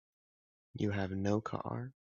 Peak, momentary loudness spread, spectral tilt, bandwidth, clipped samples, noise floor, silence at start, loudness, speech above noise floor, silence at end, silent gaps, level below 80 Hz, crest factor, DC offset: -20 dBFS; 9 LU; -7 dB/octave; 7.2 kHz; under 0.1%; under -90 dBFS; 0.75 s; -37 LUFS; over 54 dB; 0.2 s; none; -70 dBFS; 18 dB; under 0.1%